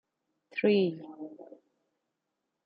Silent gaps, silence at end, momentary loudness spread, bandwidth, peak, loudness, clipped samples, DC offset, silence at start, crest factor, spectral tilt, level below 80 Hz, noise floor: none; 1.25 s; 19 LU; 5.4 kHz; -14 dBFS; -29 LUFS; under 0.1%; under 0.1%; 0.55 s; 20 dB; -5.5 dB/octave; -86 dBFS; -84 dBFS